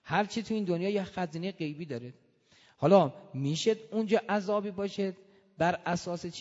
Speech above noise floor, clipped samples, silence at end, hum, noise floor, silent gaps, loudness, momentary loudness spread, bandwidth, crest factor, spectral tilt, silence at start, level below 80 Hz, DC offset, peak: 33 dB; under 0.1%; 0 s; none; -63 dBFS; none; -31 LUFS; 13 LU; 8 kHz; 22 dB; -6 dB/octave; 0.05 s; -68 dBFS; under 0.1%; -8 dBFS